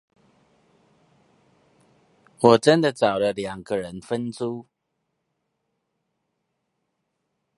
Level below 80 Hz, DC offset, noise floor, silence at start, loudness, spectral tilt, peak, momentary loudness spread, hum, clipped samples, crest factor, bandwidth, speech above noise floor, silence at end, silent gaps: -64 dBFS; under 0.1%; -77 dBFS; 2.4 s; -22 LUFS; -5.5 dB/octave; 0 dBFS; 14 LU; none; under 0.1%; 26 dB; 11.5 kHz; 56 dB; 2.95 s; none